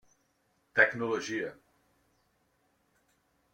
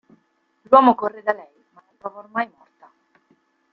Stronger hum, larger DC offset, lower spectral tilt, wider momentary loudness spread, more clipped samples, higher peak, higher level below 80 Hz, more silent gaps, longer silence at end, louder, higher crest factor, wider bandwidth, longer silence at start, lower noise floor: neither; neither; second, -4 dB/octave vs -7.5 dB/octave; second, 11 LU vs 22 LU; neither; second, -8 dBFS vs -2 dBFS; second, -76 dBFS vs -70 dBFS; neither; first, 2 s vs 1.25 s; second, -29 LUFS vs -19 LUFS; first, 26 dB vs 20 dB; first, 16.5 kHz vs 5.4 kHz; about the same, 0.75 s vs 0.7 s; first, -74 dBFS vs -66 dBFS